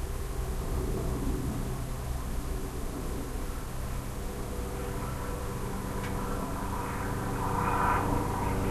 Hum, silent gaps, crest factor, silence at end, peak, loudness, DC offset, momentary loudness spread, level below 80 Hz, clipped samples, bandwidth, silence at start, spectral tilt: none; none; 18 dB; 0 s; -14 dBFS; -34 LUFS; 0.2%; 8 LU; -36 dBFS; under 0.1%; 13 kHz; 0 s; -6 dB/octave